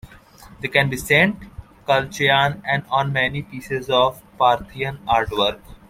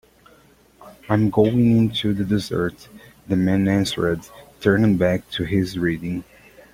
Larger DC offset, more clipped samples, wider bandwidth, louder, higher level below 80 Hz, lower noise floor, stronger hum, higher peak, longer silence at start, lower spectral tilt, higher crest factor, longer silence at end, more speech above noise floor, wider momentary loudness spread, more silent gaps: neither; neither; about the same, 16.5 kHz vs 16.5 kHz; about the same, -19 LUFS vs -21 LUFS; about the same, -46 dBFS vs -48 dBFS; second, -45 dBFS vs -53 dBFS; neither; about the same, -2 dBFS vs -2 dBFS; second, 0.05 s vs 0.8 s; second, -4.5 dB/octave vs -7 dB/octave; about the same, 18 dB vs 18 dB; second, 0.15 s vs 0.5 s; second, 25 dB vs 34 dB; first, 11 LU vs 8 LU; neither